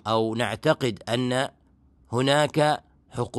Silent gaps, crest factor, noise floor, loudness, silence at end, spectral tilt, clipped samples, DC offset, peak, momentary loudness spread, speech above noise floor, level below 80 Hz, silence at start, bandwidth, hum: none; 18 dB; -59 dBFS; -25 LUFS; 0 s; -5 dB/octave; under 0.1%; under 0.1%; -6 dBFS; 10 LU; 35 dB; -58 dBFS; 0.05 s; 12.5 kHz; none